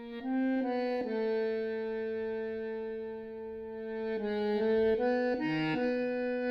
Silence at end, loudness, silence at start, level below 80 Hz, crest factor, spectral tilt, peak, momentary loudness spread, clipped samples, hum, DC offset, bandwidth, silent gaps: 0 s; -33 LUFS; 0 s; -64 dBFS; 12 dB; -7.5 dB/octave; -20 dBFS; 11 LU; under 0.1%; none; under 0.1%; 6 kHz; none